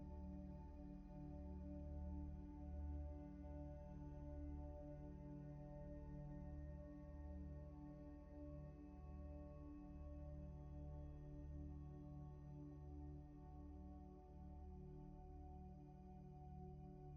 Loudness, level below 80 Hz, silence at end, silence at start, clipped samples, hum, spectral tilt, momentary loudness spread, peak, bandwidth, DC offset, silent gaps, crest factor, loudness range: -57 LUFS; -58 dBFS; 0 s; 0 s; under 0.1%; none; -10.5 dB/octave; 6 LU; -42 dBFS; 6.2 kHz; under 0.1%; none; 14 dB; 5 LU